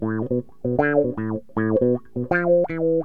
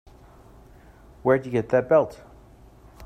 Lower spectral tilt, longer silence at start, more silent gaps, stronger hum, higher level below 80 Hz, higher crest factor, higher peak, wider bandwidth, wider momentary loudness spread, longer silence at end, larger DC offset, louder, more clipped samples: first, -11 dB/octave vs -8 dB/octave; second, 0 s vs 1.25 s; neither; neither; about the same, -54 dBFS vs -52 dBFS; about the same, 16 dB vs 20 dB; about the same, -4 dBFS vs -6 dBFS; second, 4.6 kHz vs 9.4 kHz; about the same, 7 LU vs 8 LU; about the same, 0 s vs 0 s; first, 0.7% vs under 0.1%; about the same, -22 LUFS vs -23 LUFS; neither